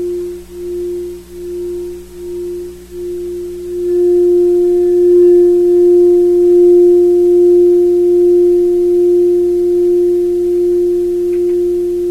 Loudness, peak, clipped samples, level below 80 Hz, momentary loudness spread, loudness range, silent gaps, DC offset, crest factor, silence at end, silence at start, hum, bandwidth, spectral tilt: -10 LUFS; -2 dBFS; under 0.1%; -40 dBFS; 16 LU; 14 LU; none; under 0.1%; 8 dB; 0 s; 0 s; 60 Hz at -40 dBFS; 8.2 kHz; -7.5 dB/octave